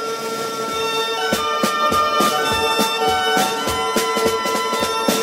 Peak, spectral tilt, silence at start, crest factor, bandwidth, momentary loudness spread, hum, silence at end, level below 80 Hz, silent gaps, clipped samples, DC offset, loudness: -2 dBFS; -2.5 dB/octave; 0 s; 16 dB; 16.5 kHz; 6 LU; none; 0 s; -48 dBFS; none; under 0.1%; under 0.1%; -18 LUFS